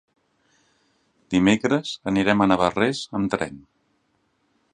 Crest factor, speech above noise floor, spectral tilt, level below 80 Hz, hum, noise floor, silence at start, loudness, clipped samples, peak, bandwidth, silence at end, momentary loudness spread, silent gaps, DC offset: 22 dB; 47 dB; -5.5 dB/octave; -52 dBFS; none; -69 dBFS; 1.3 s; -22 LUFS; under 0.1%; -2 dBFS; 10 kHz; 1.15 s; 7 LU; none; under 0.1%